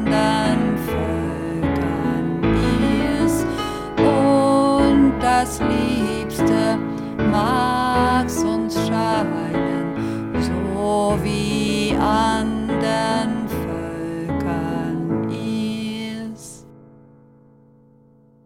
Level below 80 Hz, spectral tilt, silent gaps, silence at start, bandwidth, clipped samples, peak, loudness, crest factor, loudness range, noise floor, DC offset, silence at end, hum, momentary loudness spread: -36 dBFS; -6 dB/octave; none; 0 s; 16.5 kHz; under 0.1%; -4 dBFS; -20 LUFS; 16 dB; 8 LU; -52 dBFS; under 0.1%; 1.7 s; none; 9 LU